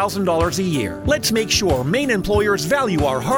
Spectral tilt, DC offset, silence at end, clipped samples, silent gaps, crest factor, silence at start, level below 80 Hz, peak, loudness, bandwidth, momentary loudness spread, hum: -4.5 dB/octave; under 0.1%; 0 s; under 0.1%; none; 14 dB; 0 s; -34 dBFS; -4 dBFS; -18 LUFS; over 20 kHz; 3 LU; none